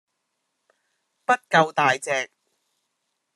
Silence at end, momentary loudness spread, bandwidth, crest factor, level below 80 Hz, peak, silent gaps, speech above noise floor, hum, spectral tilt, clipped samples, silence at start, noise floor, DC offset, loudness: 1.1 s; 12 LU; 12.5 kHz; 22 dB; -76 dBFS; -4 dBFS; none; 56 dB; none; -3.5 dB/octave; under 0.1%; 1.3 s; -77 dBFS; under 0.1%; -22 LUFS